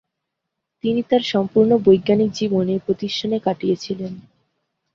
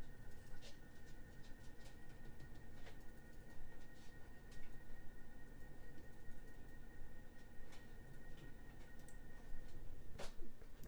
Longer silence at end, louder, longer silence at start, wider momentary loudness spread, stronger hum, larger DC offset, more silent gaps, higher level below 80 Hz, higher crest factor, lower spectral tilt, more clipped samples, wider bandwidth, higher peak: first, 0.75 s vs 0 s; first, -19 LUFS vs -61 LUFS; first, 0.85 s vs 0 s; first, 12 LU vs 3 LU; neither; neither; neither; about the same, -58 dBFS vs -56 dBFS; about the same, 18 dB vs 14 dB; first, -6.5 dB/octave vs -5 dB/octave; neither; second, 7.4 kHz vs over 20 kHz; first, -2 dBFS vs -32 dBFS